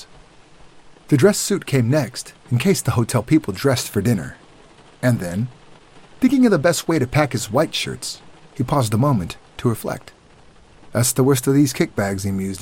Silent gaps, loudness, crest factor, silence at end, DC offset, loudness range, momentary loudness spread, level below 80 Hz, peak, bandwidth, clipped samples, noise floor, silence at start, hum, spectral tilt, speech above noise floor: none; -19 LUFS; 18 dB; 0 s; 0.2%; 3 LU; 12 LU; -48 dBFS; -2 dBFS; 16.5 kHz; under 0.1%; -49 dBFS; 0 s; none; -5.5 dB/octave; 30 dB